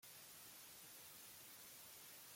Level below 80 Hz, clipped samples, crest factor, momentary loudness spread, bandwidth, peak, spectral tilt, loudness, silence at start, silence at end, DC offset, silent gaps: -90 dBFS; under 0.1%; 14 dB; 0 LU; 16.5 kHz; -48 dBFS; -0.5 dB/octave; -57 LUFS; 0 s; 0 s; under 0.1%; none